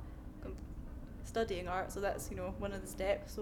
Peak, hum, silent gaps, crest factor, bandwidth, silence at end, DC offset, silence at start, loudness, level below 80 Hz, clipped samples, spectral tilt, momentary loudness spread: -22 dBFS; none; none; 18 dB; 19 kHz; 0 s; under 0.1%; 0 s; -41 LUFS; -48 dBFS; under 0.1%; -5 dB/octave; 12 LU